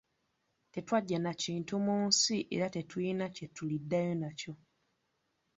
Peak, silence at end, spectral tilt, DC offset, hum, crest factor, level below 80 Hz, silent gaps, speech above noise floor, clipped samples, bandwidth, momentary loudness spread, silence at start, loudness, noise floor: -14 dBFS; 1.05 s; -4.5 dB/octave; under 0.1%; none; 22 dB; -74 dBFS; none; 46 dB; under 0.1%; 8 kHz; 16 LU; 0.75 s; -34 LUFS; -80 dBFS